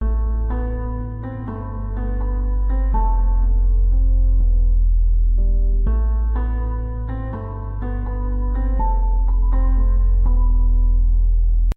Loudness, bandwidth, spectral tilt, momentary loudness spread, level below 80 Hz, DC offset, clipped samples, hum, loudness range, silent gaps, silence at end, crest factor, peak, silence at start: -22 LUFS; 2 kHz; -11 dB/octave; 8 LU; -16 dBFS; under 0.1%; under 0.1%; none; 4 LU; none; 0.05 s; 8 dB; -8 dBFS; 0 s